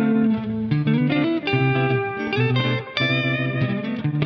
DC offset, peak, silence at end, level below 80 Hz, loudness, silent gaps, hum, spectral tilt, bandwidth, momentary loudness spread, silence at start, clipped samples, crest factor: under 0.1%; -4 dBFS; 0 s; -54 dBFS; -21 LUFS; none; none; -8.5 dB/octave; 6.2 kHz; 4 LU; 0 s; under 0.1%; 18 dB